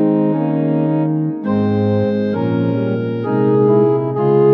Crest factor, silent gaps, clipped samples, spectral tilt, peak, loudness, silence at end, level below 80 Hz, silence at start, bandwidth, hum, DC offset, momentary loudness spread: 12 dB; none; under 0.1%; -11.5 dB/octave; -2 dBFS; -16 LUFS; 0 s; -64 dBFS; 0 s; 5.6 kHz; none; under 0.1%; 6 LU